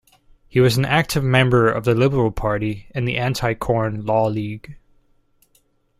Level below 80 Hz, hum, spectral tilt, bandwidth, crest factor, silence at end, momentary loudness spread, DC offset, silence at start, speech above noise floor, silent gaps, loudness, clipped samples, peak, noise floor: -40 dBFS; none; -6 dB/octave; 16 kHz; 18 dB; 1.25 s; 9 LU; under 0.1%; 0.55 s; 43 dB; none; -19 LUFS; under 0.1%; -2 dBFS; -62 dBFS